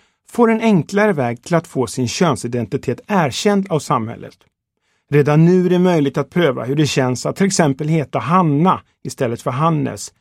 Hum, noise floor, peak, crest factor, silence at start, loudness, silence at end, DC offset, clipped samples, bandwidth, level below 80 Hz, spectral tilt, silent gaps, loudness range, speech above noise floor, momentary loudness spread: none; -68 dBFS; 0 dBFS; 16 dB; 0.35 s; -17 LUFS; 0.15 s; under 0.1%; under 0.1%; 14.5 kHz; -56 dBFS; -6 dB/octave; none; 4 LU; 51 dB; 9 LU